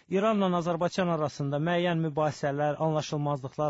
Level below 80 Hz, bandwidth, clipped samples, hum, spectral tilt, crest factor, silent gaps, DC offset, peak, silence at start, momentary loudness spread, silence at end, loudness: -66 dBFS; 8 kHz; under 0.1%; none; -6.5 dB/octave; 12 dB; none; under 0.1%; -16 dBFS; 0.1 s; 4 LU; 0 s; -28 LUFS